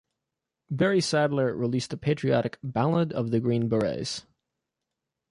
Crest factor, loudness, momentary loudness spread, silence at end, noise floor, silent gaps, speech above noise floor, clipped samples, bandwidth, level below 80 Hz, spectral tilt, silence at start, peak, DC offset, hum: 16 dB; -26 LUFS; 7 LU; 1.1 s; -86 dBFS; none; 60 dB; under 0.1%; 11.5 kHz; -60 dBFS; -6 dB/octave; 0.7 s; -12 dBFS; under 0.1%; none